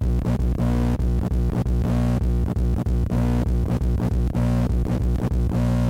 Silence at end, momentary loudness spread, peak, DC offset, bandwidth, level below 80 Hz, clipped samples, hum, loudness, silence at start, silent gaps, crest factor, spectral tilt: 0 s; 2 LU; -12 dBFS; under 0.1%; 11.5 kHz; -24 dBFS; under 0.1%; 60 Hz at -25 dBFS; -23 LUFS; 0 s; none; 8 dB; -8.5 dB/octave